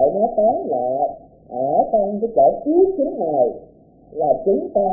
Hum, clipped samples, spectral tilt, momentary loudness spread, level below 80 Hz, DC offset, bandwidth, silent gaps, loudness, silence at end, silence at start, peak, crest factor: none; under 0.1%; -17 dB/octave; 8 LU; -52 dBFS; under 0.1%; 0.9 kHz; none; -19 LUFS; 0 s; 0 s; -4 dBFS; 14 dB